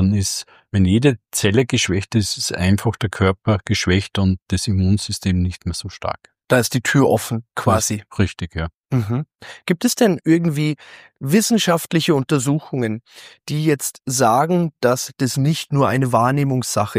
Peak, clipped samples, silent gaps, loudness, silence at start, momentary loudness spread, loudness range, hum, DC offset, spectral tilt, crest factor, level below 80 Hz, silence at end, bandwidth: -2 dBFS; under 0.1%; 4.42-4.46 s, 8.74-8.84 s, 9.35-9.39 s; -19 LUFS; 0 s; 10 LU; 2 LU; none; under 0.1%; -5 dB/octave; 18 dB; -44 dBFS; 0 s; 15.5 kHz